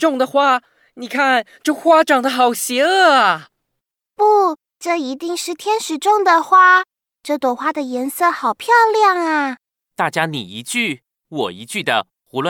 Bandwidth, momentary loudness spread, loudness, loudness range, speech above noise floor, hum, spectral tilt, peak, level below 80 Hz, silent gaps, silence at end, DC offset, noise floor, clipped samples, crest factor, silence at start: 19 kHz; 13 LU; -16 LUFS; 3 LU; 63 dB; none; -3 dB/octave; -2 dBFS; -74 dBFS; none; 0 s; under 0.1%; -78 dBFS; under 0.1%; 14 dB; 0 s